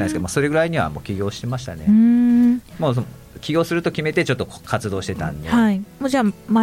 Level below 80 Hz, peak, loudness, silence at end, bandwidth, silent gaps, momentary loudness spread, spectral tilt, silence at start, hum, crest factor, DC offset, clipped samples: -44 dBFS; -6 dBFS; -20 LUFS; 0 s; 15.5 kHz; none; 11 LU; -6.5 dB/octave; 0 s; none; 14 dB; under 0.1%; under 0.1%